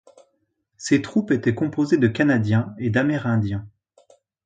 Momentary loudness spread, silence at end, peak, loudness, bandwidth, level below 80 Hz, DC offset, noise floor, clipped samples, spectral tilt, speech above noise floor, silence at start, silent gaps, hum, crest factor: 5 LU; 0.75 s; -4 dBFS; -21 LUFS; 9.4 kHz; -52 dBFS; under 0.1%; -71 dBFS; under 0.1%; -7 dB/octave; 51 dB; 0.8 s; none; none; 18 dB